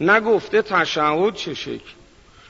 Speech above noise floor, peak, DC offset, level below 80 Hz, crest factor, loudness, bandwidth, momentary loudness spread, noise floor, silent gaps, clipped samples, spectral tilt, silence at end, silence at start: 29 dB; -4 dBFS; under 0.1%; -56 dBFS; 16 dB; -19 LUFS; 7.8 kHz; 14 LU; -48 dBFS; none; under 0.1%; -4.5 dB/octave; 0.6 s; 0 s